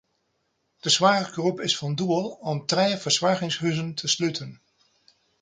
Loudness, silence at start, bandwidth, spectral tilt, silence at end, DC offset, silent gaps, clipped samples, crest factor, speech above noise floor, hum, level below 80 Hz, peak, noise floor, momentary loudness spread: -24 LUFS; 0.85 s; 9.6 kHz; -3.5 dB/octave; 0.85 s; under 0.1%; none; under 0.1%; 22 dB; 49 dB; none; -68 dBFS; -4 dBFS; -73 dBFS; 10 LU